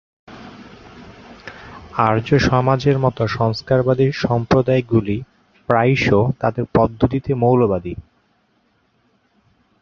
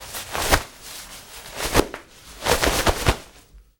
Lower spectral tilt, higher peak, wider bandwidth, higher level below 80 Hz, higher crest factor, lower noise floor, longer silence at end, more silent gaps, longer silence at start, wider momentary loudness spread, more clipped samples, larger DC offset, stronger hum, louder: first, -7.5 dB/octave vs -3 dB/octave; about the same, 0 dBFS vs -2 dBFS; second, 7 kHz vs over 20 kHz; second, -42 dBFS vs -32 dBFS; about the same, 18 dB vs 22 dB; first, -62 dBFS vs -49 dBFS; first, 1.8 s vs 0.2 s; neither; first, 0.3 s vs 0 s; first, 21 LU vs 18 LU; neither; neither; neither; first, -17 LUFS vs -22 LUFS